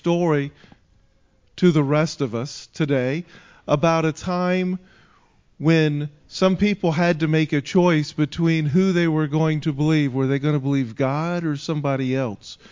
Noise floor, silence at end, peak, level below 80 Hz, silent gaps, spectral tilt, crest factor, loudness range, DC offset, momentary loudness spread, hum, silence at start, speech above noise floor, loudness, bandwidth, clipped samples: -59 dBFS; 0.15 s; -4 dBFS; -54 dBFS; none; -7 dB/octave; 18 dB; 4 LU; under 0.1%; 8 LU; none; 0.05 s; 38 dB; -21 LUFS; 7.6 kHz; under 0.1%